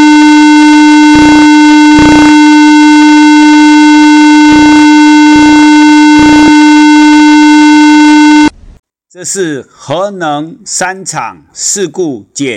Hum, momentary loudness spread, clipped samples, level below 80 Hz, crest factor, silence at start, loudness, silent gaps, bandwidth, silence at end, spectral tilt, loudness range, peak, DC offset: none; 13 LU; under 0.1%; -32 dBFS; 4 dB; 0 s; -3 LUFS; none; 10 kHz; 0 s; -3.5 dB/octave; 11 LU; 0 dBFS; under 0.1%